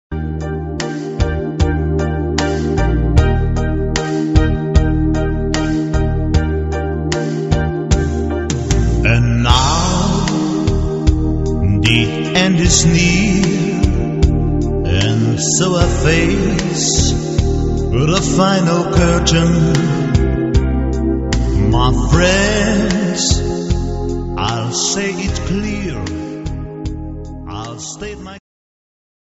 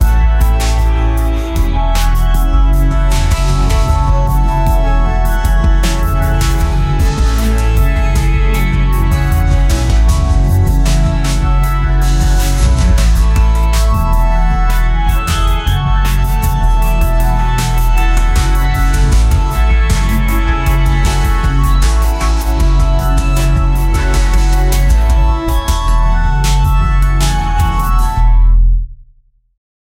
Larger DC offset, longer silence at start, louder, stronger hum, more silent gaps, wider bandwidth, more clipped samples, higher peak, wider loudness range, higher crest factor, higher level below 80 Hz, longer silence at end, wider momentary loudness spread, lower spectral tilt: neither; about the same, 0.1 s vs 0 s; about the same, -15 LUFS vs -13 LUFS; neither; neither; second, 8.2 kHz vs 16.5 kHz; neither; about the same, 0 dBFS vs 0 dBFS; first, 6 LU vs 1 LU; first, 14 dB vs 8 dB; second, -20 dBFS vs -10 dBFS; about the same, 0.9 s vs 0.95 s; first, 10 LU vs 3 LU; about the same, -5 dB/octave vs -5.5 dB/octave